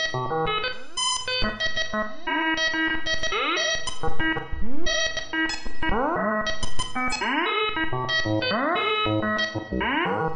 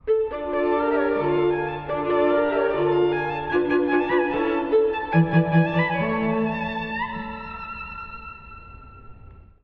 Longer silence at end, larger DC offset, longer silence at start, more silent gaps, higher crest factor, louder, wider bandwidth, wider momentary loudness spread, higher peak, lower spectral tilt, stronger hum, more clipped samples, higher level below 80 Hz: second, 0 s vs 0.25 s; neither; about the same, 0 s vs 0.05 s; neither; about the same, 12 dB vs 16 dB; second, -25 LUFS vs -22 LUFS; first, 9.8 kHz vs 5.2 kHz; second, 5 LU vs 14 LU; second, -10 dBFS vs -6 dBFS; second, -3 dB/octave vs -9.5 dB/octave; neither; neither; first, -38 dBFS vs -48 dBFS